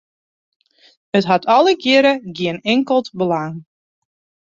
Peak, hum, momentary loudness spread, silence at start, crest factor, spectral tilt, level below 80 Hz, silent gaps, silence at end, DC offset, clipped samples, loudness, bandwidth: -2 dBFS; none; 10 LU; 1.15 s; 18 dB; -5.5 dB/octave; -62 dBFS; none; 0.8 s; under 0.1%; under 0.1%; -16 LUFS; 7.6 kHz